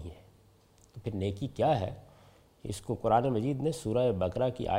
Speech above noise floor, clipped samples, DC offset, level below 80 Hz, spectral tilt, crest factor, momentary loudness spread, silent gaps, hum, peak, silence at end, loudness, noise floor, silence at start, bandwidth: 32 dB; under 0.1%; under 0.1%; -56 dBFS; -7 dB/octave; 18 dB; 15 LU; none; none; -12 dBFS; 0 s; -31 LUFS; -62 dBFS; 0 s; 16 kHz